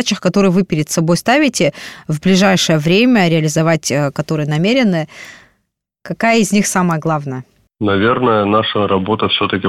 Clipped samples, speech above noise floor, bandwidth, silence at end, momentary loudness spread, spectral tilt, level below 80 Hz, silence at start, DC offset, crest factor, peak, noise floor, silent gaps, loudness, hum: under 0.1%; 55 dB; 15.5 kHz; 0 s; 9 LU; -5 dB/octave; -50 dBFS; 0 s; 0.3%; 12 dB; -2 dBFS; -68 dBFS; none; -14 LUFS; none